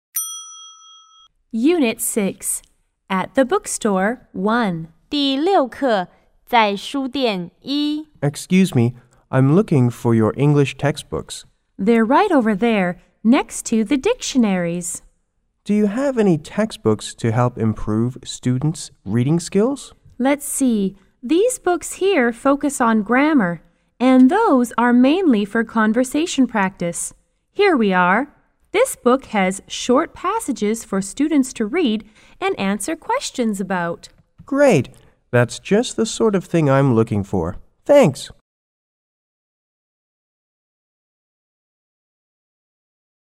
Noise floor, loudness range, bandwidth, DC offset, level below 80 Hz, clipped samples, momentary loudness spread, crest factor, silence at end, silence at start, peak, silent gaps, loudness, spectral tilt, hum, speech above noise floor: -67 dBFS; 5 LU; 16 kHz; under 0.1%; -50 dBFS; under 0.1%; 10 LU; 18 dB; 5 s; 0.15 s; -2 dBFS; none; -18 LUFS; -5.5 dB/octave; none; 49 dB